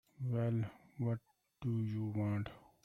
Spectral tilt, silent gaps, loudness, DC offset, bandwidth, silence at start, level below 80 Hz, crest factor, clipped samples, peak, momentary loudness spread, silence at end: -10 dB/octave; none; -40 LUFS; under 0.1%; 5.4 kHz; 0.2 s; -68 dBFS; 12 dB; under 0.1%; -28 dBFS; 8 LU; 0.25 s